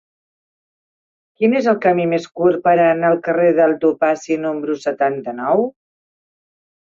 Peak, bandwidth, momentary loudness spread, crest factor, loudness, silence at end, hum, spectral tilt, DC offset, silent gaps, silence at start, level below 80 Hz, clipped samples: -2 dBFS; 7.6 kHz; 7 LU; 16 dB; -17 LUFS; 1.15 s; none; -7 dB/octave; under 0.1%; none; 1.4 s; -64 dBFS; under 0.1%